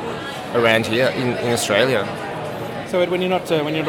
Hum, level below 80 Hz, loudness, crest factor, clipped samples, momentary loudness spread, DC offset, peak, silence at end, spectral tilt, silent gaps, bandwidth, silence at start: none; -54 dBFS; -20 LUFS; 18 dB; under 0.1%; 11 LU; under 0.1%; -2 dBFS; 0 s; -4.5 dB/octave; none; 19 kHz; 0 s